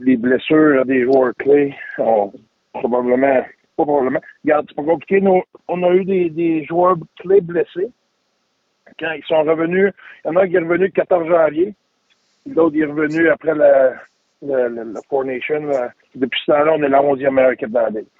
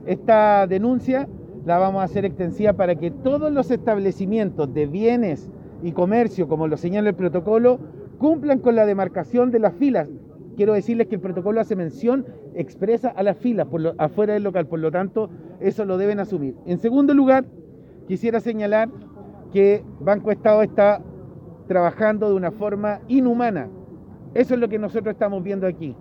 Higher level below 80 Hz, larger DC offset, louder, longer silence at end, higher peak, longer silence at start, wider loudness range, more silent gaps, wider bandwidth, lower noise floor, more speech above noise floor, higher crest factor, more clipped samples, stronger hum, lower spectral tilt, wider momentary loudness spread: second, -60 dBFS vs -54 dBFS; neither; first, -17 LUFS vs -20 LUFS; about the same, 0.15 s vs 0.05 s; about the same, -2 dBFS vs -2 dBFS; about the same, 0 s vs 0 s; about the same, 3 LU vs 3 LU; neither; about the same, 7 kHz vs 7.2 kHz; first, -67 dBFS vs -40 dBFS; first, 51 dB vs 20 dB; about the same, 14 dB vs 18 dB; neither; neither; about the same, -8 dB/octave vs -9 dB/octave; about the same, 9 LU vs 10 LU